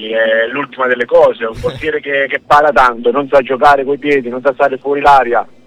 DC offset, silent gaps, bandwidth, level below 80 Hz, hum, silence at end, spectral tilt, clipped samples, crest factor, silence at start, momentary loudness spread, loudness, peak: under 0.1%; none; 11.5 kHz; -40 dBFS; none; 0.2 s; -5 dB/octave; under 0.1%; 12 dB; 0 s; 8 LU; -12 LUFS; 0 dBFS